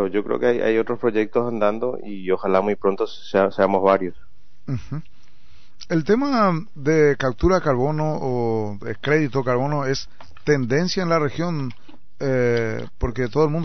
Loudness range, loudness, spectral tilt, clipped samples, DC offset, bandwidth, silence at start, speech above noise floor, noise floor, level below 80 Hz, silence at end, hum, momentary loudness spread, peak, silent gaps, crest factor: 2 LU; -21 LUFS; -5.5 dB/octave; under 0.1%; 3%; 6.4 kHz; 0 s; 33 dB; -54 dBFS; -42 dBFS; 0 s; none; 11 LU; -4 dBFS; none; 18 dB